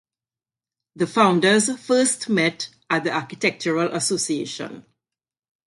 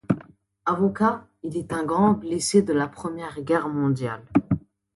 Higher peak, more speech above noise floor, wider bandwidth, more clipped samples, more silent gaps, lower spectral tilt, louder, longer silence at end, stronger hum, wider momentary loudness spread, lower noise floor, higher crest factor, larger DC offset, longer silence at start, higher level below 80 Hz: first, -2 dBFS vs -6 dBFS; first, over 69 dB vs 25 dB; about the same, 11.5 kHz vs 11.5 kHz; neither; neither; second, -3.5 dB/octave vs -6 dB/octave; first, -21 LUFS vs -24 LUFS; first, 0.85 s vs 0.35 s; neither; about the same, 11 LU vs 11 LU; first, under -90 dBFS vs -48 dBFS; about the same, 22 dB vs 18 dB; neither; first, 0.95 s vs 0.1 s; second, -68 dBFS vs -54 dBFS